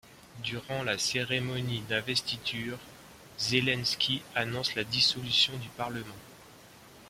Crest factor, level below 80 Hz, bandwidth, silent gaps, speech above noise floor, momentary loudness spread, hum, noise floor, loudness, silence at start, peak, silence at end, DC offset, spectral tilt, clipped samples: 22 dB; -62 dBFS; 16.5 kHz; none; 22 dB; 14 LU; none; -53 dBFS; -29 LUFS; 0.05 s; -10 dBFS; 0 s; under 0.1%; -3 dB/octave; under 0.1%